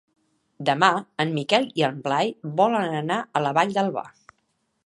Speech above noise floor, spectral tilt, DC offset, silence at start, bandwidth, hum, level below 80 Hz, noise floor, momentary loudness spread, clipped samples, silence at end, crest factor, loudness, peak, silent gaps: 49 dB; -5 dB/octave; under 0.1%; 0.6 s; 11.5 kHz; none; -74 dBFS; -72 dBFS; 6 LU; under 0.1%; 0.75 s; 22 dB; -23 LUFS; -2 dBFS; none